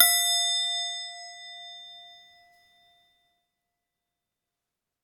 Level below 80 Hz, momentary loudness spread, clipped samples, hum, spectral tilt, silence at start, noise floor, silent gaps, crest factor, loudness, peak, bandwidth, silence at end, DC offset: -86 dBFS; 22 LU; under 0.1%; none; 6 dB/octave; 0 s; -87 dBFS; none; 30 dB; -24 LUFS; -2 dBFS; 19 kHz; 2.95 s; under 0.1%